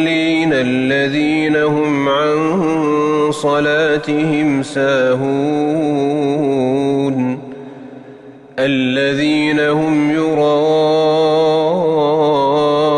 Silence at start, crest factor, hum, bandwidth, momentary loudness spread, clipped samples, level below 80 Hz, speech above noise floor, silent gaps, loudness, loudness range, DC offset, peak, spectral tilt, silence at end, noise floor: 0 s; 10 dB; none; 11 kHz; 3 LU; under 0.1%; -56 dBFS; 23 dB; none; -15 LUFS; 4 LU; under 0.1%; -4 dBFS; -6 dB/octave; 0 s; -37 dBFS